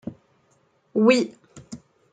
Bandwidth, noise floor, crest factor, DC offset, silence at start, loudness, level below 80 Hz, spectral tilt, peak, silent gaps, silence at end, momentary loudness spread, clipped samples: 9.4 kHz; -64 dBFS; 20 dB; under 0.1%; 0.05 s; -21 LUFS; -68 dBFS; -5 dB/octave; -4 dBFS; none; 0.35 s; 24 LU; under 0.1%